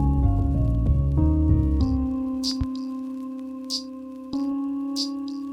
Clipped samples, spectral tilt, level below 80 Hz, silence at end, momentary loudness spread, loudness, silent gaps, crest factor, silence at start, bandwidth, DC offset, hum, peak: under 0.1%; -7 dB/octave; -28 dBFS; 0 s; 11 LU; -25 LUFS; none; 14 dB; 0 s; 10.5 kHz; under 0.1%; none; -8 dBFS